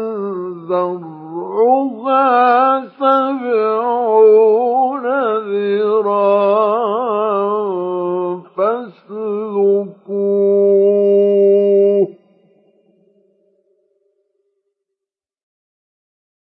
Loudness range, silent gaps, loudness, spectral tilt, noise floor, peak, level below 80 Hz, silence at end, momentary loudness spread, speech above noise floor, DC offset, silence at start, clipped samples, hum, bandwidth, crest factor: 5 LU; none; -15 LUFS; -9.5 dB/octave; -86 dBFS; 0 dBFS; -82 dBFS; 4.35 s; 11 LU; 73 dB; under 0.1%; 0 s; under 0.1%; none; 4.6 kHz; 14 dB